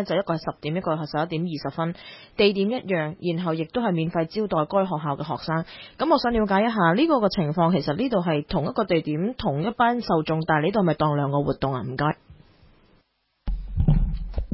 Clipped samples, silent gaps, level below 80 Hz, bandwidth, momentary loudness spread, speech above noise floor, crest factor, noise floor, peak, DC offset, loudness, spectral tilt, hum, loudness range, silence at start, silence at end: under 0.1%; none; -36 dBFS; 5.8 kHz; 8 LU; 44 dB; 16 dB; -67 dBFS; -6 dBFS; under 0.1%; -24 LUFS; -11 dB/octave; none; 4 LU; 0 s; 0 s